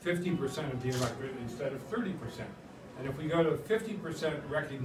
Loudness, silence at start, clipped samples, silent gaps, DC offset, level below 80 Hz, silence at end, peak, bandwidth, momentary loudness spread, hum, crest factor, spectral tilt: -35 LUFS; 0 s; under 0.1%; none; under 0.1%; -60 dBFS; 0 s; -18 dBFS; 16 kHz; 12 LU; none; 18 dB; -6 dB/octave